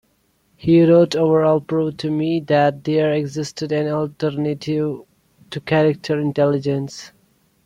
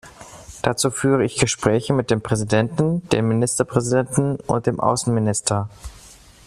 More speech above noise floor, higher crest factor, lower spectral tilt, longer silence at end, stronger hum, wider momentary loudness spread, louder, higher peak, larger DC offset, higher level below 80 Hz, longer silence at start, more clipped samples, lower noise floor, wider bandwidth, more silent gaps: first, 45 dB vs 26 dB; about the same, 16 dB vs 20 dB; first, -7 dB/octave vs -5 dB/octave; first, 0.55 s vs 0.35 s; neither; first, 12 LU vs 8 LU; about the same, -19 LUFS vs -20 LUFS; about the same, -2 dBFS vs 0 dBFS; neither; second, -56 dBFS vs -48 dBFS; first, 0.65 s vs 0.05 s; neither; first, -63 dBFS vs -46 dBFS; second, 11.5 kHz vs 13.5 kHz; neither